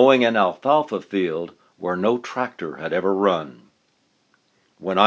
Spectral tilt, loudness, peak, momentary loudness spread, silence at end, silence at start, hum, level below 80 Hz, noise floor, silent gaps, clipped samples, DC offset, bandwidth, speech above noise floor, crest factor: -6 dB/octave; -22 LUFS; 0 dBFS; 12 LU; 0 s; 0 s; none; -66 dBFS; -65 dBFS; none; under 0.1%; under 0.1%; 7.8 kHz; 45 dB; 22 dB